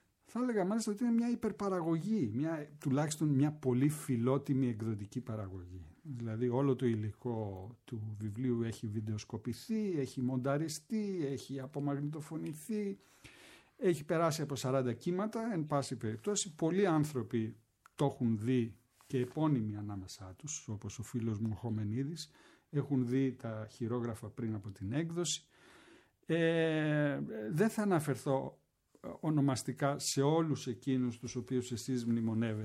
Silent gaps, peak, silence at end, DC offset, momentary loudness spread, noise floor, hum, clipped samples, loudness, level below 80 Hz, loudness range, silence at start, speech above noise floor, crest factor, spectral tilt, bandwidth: none; -18 dBFS; 0 s; under 0.1%; 11 LU; -63 dBFS; none; under 0.1%; -36 LUFS; -72 dBFS; 4 LU; 0.3 s; 28 dB; 18 dB; -6 dB/octave; 15.5 kHz